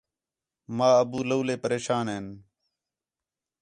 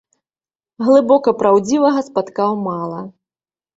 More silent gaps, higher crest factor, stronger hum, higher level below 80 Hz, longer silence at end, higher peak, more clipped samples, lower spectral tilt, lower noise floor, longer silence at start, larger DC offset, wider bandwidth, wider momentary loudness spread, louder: neither; about the same, 20 dB vs 16 dB; neither; about the same, -66 dBFS vs -62 dBFS; first, 1.2 s vs 0.65 s; second, -8 dBFS vs 0 dBFS; neither; about the same, -5.5 dB/octave vs -6 dB/octave; about the same, under -90 dBFS vs under -90 dBFS; about the same, 0.7 s vs 0.8 s; neither; first, 10.5 kHz vs 7.8 kHz; about the same, 15 LU vs 14 LU; second, -26 LUFS vs -15 LUFS